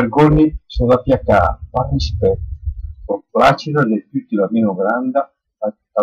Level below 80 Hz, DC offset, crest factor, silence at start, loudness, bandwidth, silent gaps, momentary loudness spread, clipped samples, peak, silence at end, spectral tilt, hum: -30 dBFS; under 0.1%; 12 dB; 0 s; -16 LUFS; 9.8 kHz; none; 13 LU; under 0.1%; -4 dBFS; 0 s; -8 dB/octave; none